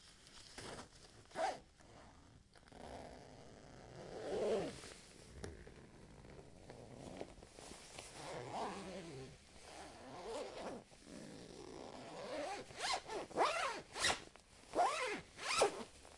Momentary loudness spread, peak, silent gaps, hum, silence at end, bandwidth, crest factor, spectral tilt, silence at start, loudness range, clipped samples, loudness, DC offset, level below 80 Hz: 22 LU; -22 dBFS; none; none; 0 s; 11.5 kHz; 24 dB; -2.5 dB/octave; 0 s; 12 LU; under 0.1%; -44 LUFS; under 0.1%; -68 dBFS